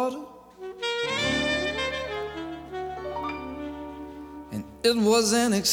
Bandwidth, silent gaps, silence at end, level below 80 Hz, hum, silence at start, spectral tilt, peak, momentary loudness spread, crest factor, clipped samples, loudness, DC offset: 18.5 kHz; none; 0 s; -50 dBFS; none; 0 s; -3 dB/octave; -8 dBFS; 19 LU; 20 dB; under 0.1%; -27 LUFS; under 0.1%